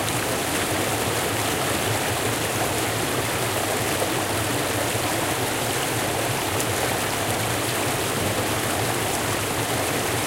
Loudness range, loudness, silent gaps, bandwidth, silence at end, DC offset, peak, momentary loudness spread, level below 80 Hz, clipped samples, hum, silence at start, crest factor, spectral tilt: 0 LU; -23 LUFS; none; 16 kHz; 0 s; under 0.1%; -6 dBFS; 1 LU; -46 dBFS; under 0.1%; none; 0 s; 18 dB; -3 dB/octave